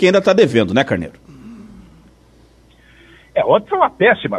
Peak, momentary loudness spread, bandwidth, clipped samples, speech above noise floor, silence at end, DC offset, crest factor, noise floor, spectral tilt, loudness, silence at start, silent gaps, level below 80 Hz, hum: 0 dBFS; 18 LU; 11 kHz; under 0.1%; 35 dB; 0 s; under 0.1%; 16 dB; -49 dBFS; -6 dB/octave; -15 LUFS; 0 s; none; -50 dBFS; none